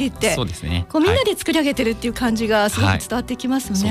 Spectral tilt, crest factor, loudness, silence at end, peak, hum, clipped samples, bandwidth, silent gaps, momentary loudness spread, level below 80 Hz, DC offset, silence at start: -4.5 dB/octave; 12 dB; -19 LUFS; 0 s; -6 dBFS; none; under 0.1%; 15.5 kHz; none; 6 LU; -38 dBFS; under 0.1%; 0 s